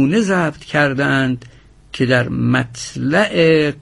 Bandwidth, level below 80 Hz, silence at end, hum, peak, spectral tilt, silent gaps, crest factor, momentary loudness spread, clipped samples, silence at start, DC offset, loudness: 11.5 kHz; -46 dBFS; 0 s; none; 0 dBFS; -6 dB/octave; none; 16 dB; 9 LU; under 0.1%; 0 s; under 0.1%; -16 LUFS